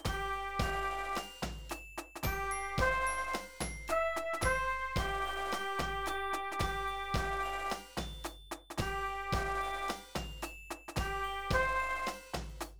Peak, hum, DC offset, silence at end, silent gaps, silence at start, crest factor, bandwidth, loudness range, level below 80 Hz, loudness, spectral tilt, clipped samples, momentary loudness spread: -18 dBFS; none; 0.2%; 0 s; none; 0 s; 18 dB; over 20 kHz; 4 LU; -46 dBFS; -36 LUFS; -4 dB/octave; under 0.1%; 11 LU